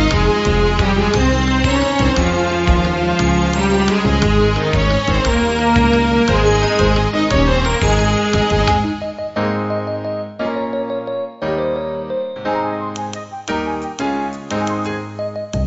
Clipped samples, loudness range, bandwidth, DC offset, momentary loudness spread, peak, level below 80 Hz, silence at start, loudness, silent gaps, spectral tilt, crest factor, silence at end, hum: under 0.1%; 7 LU; 8 kHz; under 0.1%; 9 LU; -2 dBFS; -24 dBFS; 0 s; -17 LUFS; none; -5.5 dB/octave; 16 dB; 0 s; none